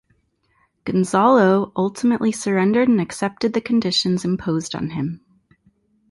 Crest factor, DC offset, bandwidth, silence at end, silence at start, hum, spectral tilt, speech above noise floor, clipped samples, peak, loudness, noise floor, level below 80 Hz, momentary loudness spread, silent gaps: 16 dB; under 0.1%; 11.5 kHz; 0.95 s; 0.85 s; none; -5.5 dB/octave; 46 dB; under 0.1%; -4 dBFS; -19 LUFS; -64 dBFS; -56 dBFS; 11 LU; none